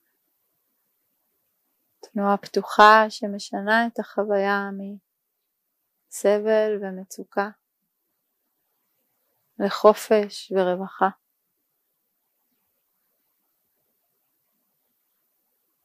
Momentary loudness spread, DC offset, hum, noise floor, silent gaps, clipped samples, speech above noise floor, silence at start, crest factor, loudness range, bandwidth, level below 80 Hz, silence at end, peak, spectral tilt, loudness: 17 LU; under 0.1%; none; -77 dBFS; none; under 0.1%; 56 dB; 2.15 s; 24 dB; 9 LU; 15.5 kHz; -76 dBFS; 4.75 s; 0 dBFS; -4.5 dB/octave; -22 LUFS